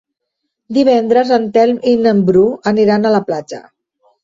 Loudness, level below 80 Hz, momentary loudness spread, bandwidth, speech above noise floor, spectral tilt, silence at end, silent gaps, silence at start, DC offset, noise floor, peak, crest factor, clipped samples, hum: -13 LUFS; -54 dBFS; 11 LU; 7.6 kHz; 62 dB; -7 dB/octave; 0.65 s; none; 0.7 s; under 0.1%; -74 dBFS; -2 dBFS; 12 dB; under 0.1%; none